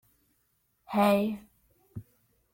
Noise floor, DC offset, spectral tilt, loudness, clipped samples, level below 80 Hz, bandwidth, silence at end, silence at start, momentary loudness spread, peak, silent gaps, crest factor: -74 dBFS; under 0.1%; -6.5 dB/octave; -27 LUFS; under 0.1%; -66 dBFS; 16.5 kHz; 0.55 s; 0.9 s; 23 LU; -12 dBFS; none; 20 dB